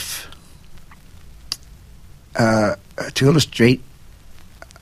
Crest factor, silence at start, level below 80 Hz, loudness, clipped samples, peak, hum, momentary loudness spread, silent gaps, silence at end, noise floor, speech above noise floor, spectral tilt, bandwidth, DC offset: 20 dB; 0 s; -44 dBFS; -19 LUFS; under 0.1%; 0 dBFS; none; 14 LU; none; 0.45 s; -42 dBFS; 27 dB; -5 dB/octave; 15.5 kHz; under 0.1%